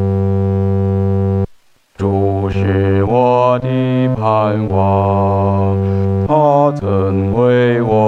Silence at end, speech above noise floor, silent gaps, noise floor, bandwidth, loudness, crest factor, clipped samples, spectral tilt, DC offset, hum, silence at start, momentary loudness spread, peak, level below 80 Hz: 0 s; 33 dB; none; -46 dBFS; 4.5 kHz; -14 LUFS; 14 dB; under 0.1%; -9.5 dB/octave; under 0.1%; none; 0 s; 4 LU; 0 dBFS; -42 dBFS